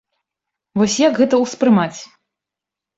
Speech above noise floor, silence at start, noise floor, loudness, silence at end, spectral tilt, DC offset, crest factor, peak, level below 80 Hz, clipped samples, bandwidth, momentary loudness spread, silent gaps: 70 dB; 0.75 s; -86 dBFS; -16 LUFS; 0.95 s; -5 dB/octave; under 0.1%; 16 dB; -2 dBFS; -60 dBFS; under 0.1%; 8 kHz; 11 LU; none